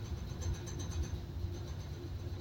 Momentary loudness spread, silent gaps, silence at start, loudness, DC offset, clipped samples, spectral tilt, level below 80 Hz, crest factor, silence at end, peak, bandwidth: 4 LU; none; 0 s; -42 LUFS; under 0.1%; under 0.1%; -5.5 dB/octave; -44 dBFS; 14 dB; 0 s; -26 dBFS; 16.5 kHz